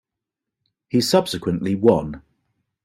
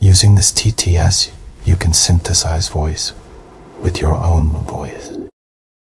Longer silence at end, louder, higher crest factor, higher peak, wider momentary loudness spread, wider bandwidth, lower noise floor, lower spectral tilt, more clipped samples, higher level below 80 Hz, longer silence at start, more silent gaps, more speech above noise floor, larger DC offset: about the same, 0.65 s vs 0.6 s; second, -20 LUFS vs -14 LUFS; first, 20 dB vs 14 dB; about the same, -2 dBFS vs 0 dBFS; second, 11 LU vs 15 LU; first, 15.5 kHz vs 12 kHz; first, -85 dBFS vs -38 dBFS; first, -5.5 dB/octave vs -4 dB/octave; neither; second, -52 dBFS vs -26 dBFS; first, 0.95 s vs 0 s; neither; first, 66 dB vs 24 dB; neither